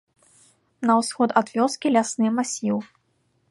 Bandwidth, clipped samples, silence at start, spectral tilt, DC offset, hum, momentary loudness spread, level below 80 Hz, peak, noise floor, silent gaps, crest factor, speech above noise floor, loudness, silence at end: 11.5 kHz; under 0.1%; 0.8 s; -4.5 dB/octave; under 0.1%; none; 6 LU; -74 dBFS; -2 dBFS; -68 dBFS; none; 20 dB; 46 dB; -22 LUFS; 0.65 s